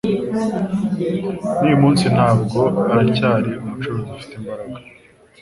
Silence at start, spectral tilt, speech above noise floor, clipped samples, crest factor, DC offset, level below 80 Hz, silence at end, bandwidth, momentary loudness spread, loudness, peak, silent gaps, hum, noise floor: 0.05 s; -7.5 dB/octave; 30 dB; under 0.1%; 16 dB; under 0.1%; -48 dBFS; 0.6 s; 11.5 kHz; 16 LU; -18 LUFS; -2 dBFS; none; none; -48 dBFS